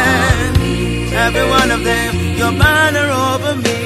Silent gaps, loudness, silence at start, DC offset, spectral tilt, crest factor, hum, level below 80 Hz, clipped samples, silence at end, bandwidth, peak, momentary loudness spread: none; -13 LUFS; 0 s; under 0.1%; -4.5 dB/octave; 14 dB; none; -24 dBFS; under 0.1%; 0 s; 15.5 kHz; 0 dBFS; 6 LU